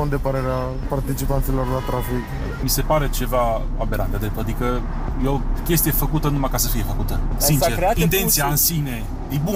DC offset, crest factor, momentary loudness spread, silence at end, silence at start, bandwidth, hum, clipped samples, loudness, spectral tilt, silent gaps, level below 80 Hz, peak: under 0.1%; 12 dB; 9 LU; 0 s; 0 s; 16 kHz; none; under 0.1%; -21 LUFS; -4.5 dB/octave; none; -24 dBFS; -8 dBFS